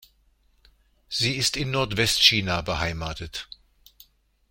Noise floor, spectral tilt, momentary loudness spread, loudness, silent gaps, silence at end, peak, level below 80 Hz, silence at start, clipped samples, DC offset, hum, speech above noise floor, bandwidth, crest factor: -63 dBFS; -3 dB/octave; 18 LU; -22 LUFS; none; 1.05 s; -2 dBFS; -46 dBFS; 1.1 s; under 0.1%; under 0.1%; none; 39 dB; 16.5 kHz; 26 dB